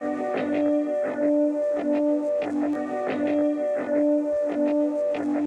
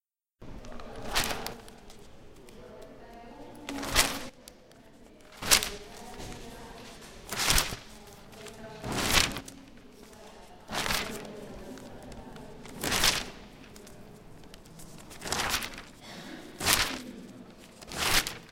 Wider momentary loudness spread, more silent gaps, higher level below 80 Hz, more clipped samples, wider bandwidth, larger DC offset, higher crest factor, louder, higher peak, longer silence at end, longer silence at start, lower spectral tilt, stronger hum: second, 4 LU vs 25 LU; neither; second, -72 dBFS vs -46 dBFS; neither; second, 8.4 kHz vs 17 kHz; neither; second, 10 dB vs 32 dB; first, -24 LUFS vs -28 LUFS; second, -14 dBFS vs -2 dBFS; about the same, 0 s vs 0 s; second, 0 s vs 0.4 s; first, -7 dB/octave vs -1.5 dB/octave; neither